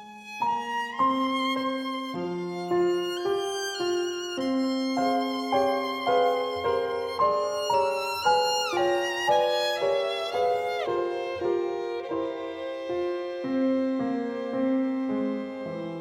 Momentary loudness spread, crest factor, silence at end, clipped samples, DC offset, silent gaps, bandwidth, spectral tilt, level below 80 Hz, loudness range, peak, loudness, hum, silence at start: 8 LU; 14 dB; 0 s; under 0.1%; under 0.1%; none; 16.5 kHz; -4 dB/octave; -70 dBFS; 4 LU; -12 dBFS; -27 LUFS; none; 0 s